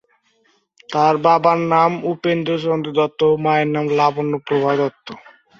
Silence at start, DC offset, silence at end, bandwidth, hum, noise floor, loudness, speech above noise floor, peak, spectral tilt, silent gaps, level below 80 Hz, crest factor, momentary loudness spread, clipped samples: 0.9 s; under 0.1%; 0.4 s; 7.4 kHz; none; -61 dBFS; -17 LUFS; 44 dB; 0 dBFS; -7 dB/octave; none; -62 dBFS; 18 dB; 8 LU; under 0.1%